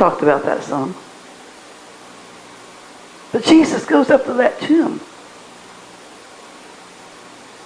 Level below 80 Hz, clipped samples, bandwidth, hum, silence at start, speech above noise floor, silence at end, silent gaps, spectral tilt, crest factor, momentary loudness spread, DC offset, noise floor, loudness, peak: -58 dBFS; under 0.1%; 11 kHz; none; 0 s; 25 dB; 0 s; none; -5 dB/octave; 20 dB; 26 LU; under 0.1%; -40 dBFS; -16 LUFS; 0 dBFS